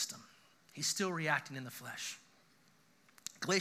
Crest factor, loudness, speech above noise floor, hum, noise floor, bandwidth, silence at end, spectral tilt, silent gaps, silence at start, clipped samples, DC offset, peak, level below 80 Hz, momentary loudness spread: 24 dB; -38 LUFS; 30 dB; none; -69 dBFS; 15.5 kHz; 0 s; -2.5 dB/octave; none; 0 s; under 0.1%; under 0.1%; -18 dBFS; under -90 dBFS; 16 LU